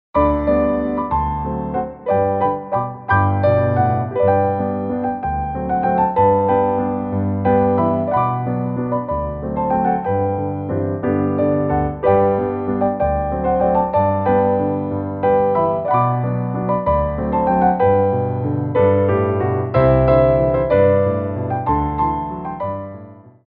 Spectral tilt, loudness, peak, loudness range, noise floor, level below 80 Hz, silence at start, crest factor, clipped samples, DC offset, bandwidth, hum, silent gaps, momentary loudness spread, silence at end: -12 dB/octave; -18 LUFS; -2 dBFS; 3 LU; -39 dBFS; -34 dBFS; 0.15 s; 14 dB; under 0.1%; under 0.1%; 4.5 kHz; none; none; 7 LU; 0.25 s